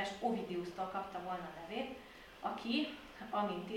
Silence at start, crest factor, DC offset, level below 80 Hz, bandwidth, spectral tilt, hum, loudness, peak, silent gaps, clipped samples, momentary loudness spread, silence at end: 0 s; 16 dB; under 0.1%; -68 dBFS; 16.5 kHz; -5.5 dB/octave; none; -41 LUFS; -24 dBFS; none; under 0.1%; 8 LU; 0 s